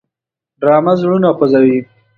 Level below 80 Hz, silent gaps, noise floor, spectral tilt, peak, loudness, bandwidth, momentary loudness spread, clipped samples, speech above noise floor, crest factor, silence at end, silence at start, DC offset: -58 dBFS; none; -84 dBFS; -9.5 dB/octave; 0 dBFS; -12 LUFS; 6.4 kHz; 5 LU; under 0.1%; 73 dB; 12 dB; 0.35 s; 0.6 s; under 0.1%